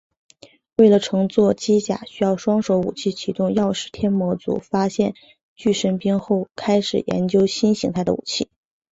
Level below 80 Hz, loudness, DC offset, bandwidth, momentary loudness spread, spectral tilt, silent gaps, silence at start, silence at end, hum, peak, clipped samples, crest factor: -54 dBFS; -20 LUFS; under 0.1%; 8 kHz; 7 LU; -6 dB/octave; 5.43-5.56 s; 0.8 s; 0.45 s; none; -2 dBFS; under 0.1%; 18 dB